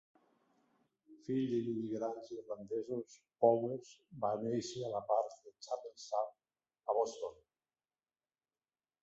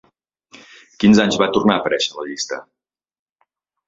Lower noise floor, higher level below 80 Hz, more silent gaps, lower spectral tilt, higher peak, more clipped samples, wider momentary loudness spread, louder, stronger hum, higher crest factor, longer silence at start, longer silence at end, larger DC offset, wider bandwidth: first, under -90 dBFS vs -86 dBFS; second, -82 dBFS vs -54 dBFS; neither; first, -6.5 dB/octave vs -4.5 dB/octave; second, -14 dBFS vs 0 dBFS; neither; about the same, 14 LU vs 13 LU; second, -38 LUFS vs -17 LUFS; neither; about the same, 24 dB vs 20 dB; about the same, 1.1 s vs 1 s; first, 1.7 s vs 1.25 s; neither; about the same, 8 kHz vs 7.8 kHz